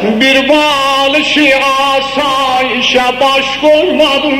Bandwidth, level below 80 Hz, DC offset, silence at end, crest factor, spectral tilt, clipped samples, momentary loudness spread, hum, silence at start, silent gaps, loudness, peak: 16.5 kHz; -42 dBFS; 0.1%; 0 s; 10 dB; -3 dB/octave; 0.1%; 3 LU; none; 0 s; none; -9 LUFS; 0 dBFS